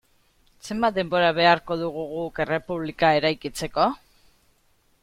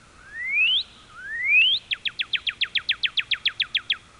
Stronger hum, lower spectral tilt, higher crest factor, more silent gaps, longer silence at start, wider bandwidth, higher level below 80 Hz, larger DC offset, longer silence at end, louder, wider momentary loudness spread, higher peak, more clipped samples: neither; first, -5 dB/octave vs 0.5 dB/octave; first, 20 dB vs 14 dB; neither; first, 0.65 s vs 0.25 s; first, 16 kHz vs 11 kHz; first, -54 dBFS vs -60 dBFS; neither; first, 1.05 s vs 0.2 s; about the same, -23 LUFS vs -22 LUFS; second, 12 LU vs 16 LU; first, -4 dBFS vs -10 dBFS; neither